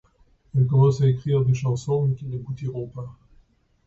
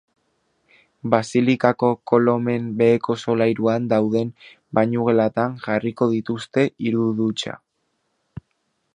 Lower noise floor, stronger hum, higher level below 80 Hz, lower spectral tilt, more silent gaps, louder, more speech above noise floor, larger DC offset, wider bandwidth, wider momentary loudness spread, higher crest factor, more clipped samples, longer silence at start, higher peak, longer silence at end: second, -59 dBFS vs -72 dBFS; neither; first, -52 dBFS vs -60 dBFS; first, -8.5 dB/octave vs -7 dB/octave; neither; second, -23 LUFS vs -20 LUFS; second, 37 dB vs 52 dB; neither; second, 7.8 kHz vs 10 kHz; first, 15 LU vs 6 LU; about the same, 16 dB vs 20 dB; neither; second, 0.55 s vs 1.05 s; second, -8 dBFS vs 0 dBFS; second, 0.75 s vs 1.4 s